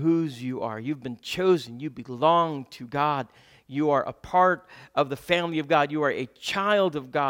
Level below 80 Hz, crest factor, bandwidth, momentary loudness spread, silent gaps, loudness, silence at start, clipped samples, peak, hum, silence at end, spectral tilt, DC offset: -62 dBFS; 20 dB; 17 kHz; 11 LU; none; -26 LUFS; 0 s; under 0.1%; -6 dBFS; none; 0 s; -6 dB/octave; under 0.1%